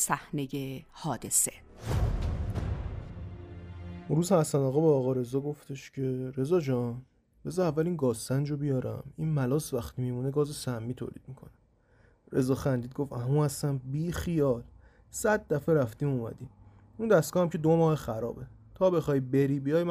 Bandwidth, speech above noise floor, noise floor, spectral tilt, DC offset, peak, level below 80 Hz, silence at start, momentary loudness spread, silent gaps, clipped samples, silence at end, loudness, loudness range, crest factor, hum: 15.5 kHz; 34 dB; -63 dBFS; -6 dB/octave; under 0.1%; -12 dBFS; -46 dBFS; 0 s; 16 LU; none; under 0.1%; 0 s; -30 LUFS; 5 LU; 18 dB; none